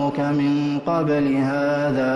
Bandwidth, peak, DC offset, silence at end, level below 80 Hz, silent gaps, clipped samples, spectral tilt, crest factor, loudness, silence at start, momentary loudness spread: 7.4 kHz; -10 dBFS; under 0.1%; 0 s; -56 dBFS; none; under 0.1%; -8 dB/octave; 10 dB; -21 LUFS; 0 s; 2 LU